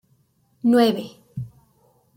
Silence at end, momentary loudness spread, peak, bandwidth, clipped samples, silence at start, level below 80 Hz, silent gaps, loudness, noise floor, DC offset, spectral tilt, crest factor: 0.7 s; 19 LU; -6 dBFS; 16.5 kHz; under 0.1%; 0.65 s; -62 dBFS; none; -20 LUFS; -63 dBFS; under 0.1%; -6.5 dB/octave; 18 dB